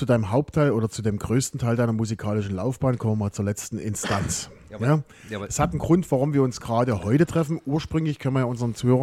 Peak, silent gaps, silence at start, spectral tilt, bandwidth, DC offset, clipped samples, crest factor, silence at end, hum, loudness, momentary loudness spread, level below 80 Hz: -8 dBFS; none; 0 s; -6.5 dB/octave; 15.5 kHz; under 0.1%; under 0.1%; 16 dB; 0 s; none; -24 LUFS; 7 LU; -46 dBFS